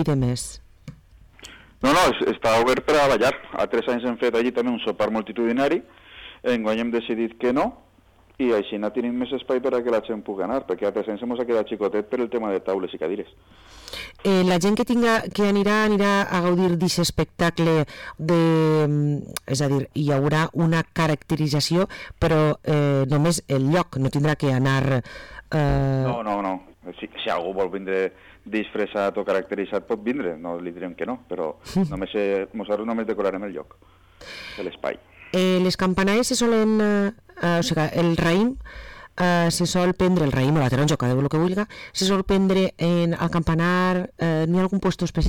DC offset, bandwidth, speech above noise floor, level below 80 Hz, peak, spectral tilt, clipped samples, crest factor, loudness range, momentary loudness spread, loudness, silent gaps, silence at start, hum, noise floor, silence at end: under 0.1%; 18 kHz; 33 dB; -44 dBFS; -12 dBFS; -6 dB/octave; under 0.1%; 10 dB; 6 LU; 11 LU; -22 LUFS; none; 0 s; none; -55 dBFS; 0 s